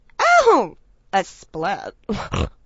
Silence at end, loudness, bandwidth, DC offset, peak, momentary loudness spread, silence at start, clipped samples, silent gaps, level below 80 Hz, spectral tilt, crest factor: 0.15 s; -20 LUFS; 8 kHz; under 0.1%; -2 dBFS; 15 LU; 0.2 s; under 0.1%; none; -38 dBFS; -4.5 dB/octave; 18 dB